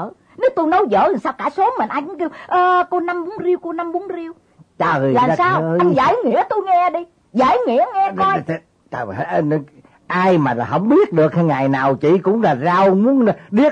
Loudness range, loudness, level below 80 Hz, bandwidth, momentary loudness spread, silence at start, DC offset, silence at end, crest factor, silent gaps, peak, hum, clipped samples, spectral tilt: 4 LU; -17 LUFS; -56 dBFS; 8.6 kHz; 11 LU; 0 s; under 0.1%; 0 s; 12 dB; none; -4 dBFS; none; under 0.1%; -8 dB/octave